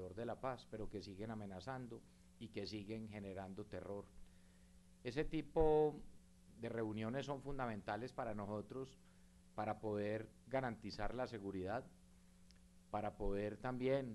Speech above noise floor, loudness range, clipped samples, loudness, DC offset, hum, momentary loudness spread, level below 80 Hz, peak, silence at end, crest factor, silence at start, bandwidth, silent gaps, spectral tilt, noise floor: 23 dB; 8 LU; under 0.1%; -45 LUFS; under 0.1%; none; 12 LU; -58 dBFS; -24 dBFS; 0 s; 22 dB; 0 s; 12 kHz; none; -7 dB/octave; -67 dBFS